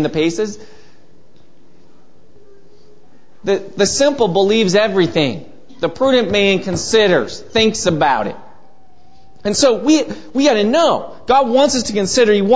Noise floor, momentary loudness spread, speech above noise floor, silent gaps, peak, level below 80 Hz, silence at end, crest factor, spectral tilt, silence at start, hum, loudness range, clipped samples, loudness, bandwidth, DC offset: -51 dBFS; 10 LU; 36 dB; none; 0 dBFS; -48 dBFS; 0 s; 16 dB; -4 dB/octave; 0 s; none; 9 LU; under 0.1%; -15 LUFS; 8 kHz; 2%